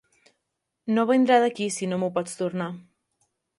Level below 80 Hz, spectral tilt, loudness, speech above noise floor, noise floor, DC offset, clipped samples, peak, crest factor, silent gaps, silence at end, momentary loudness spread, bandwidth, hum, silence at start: -76 dBFS; -5 dB/octave; -24 LUFS; 57 dB; -81 dBFS; under 0.1%; under 0.1%; -8 dBFS; 18 dB; none; 0.75 s; 15 LU; 11.5 kHz; none; 0.85 s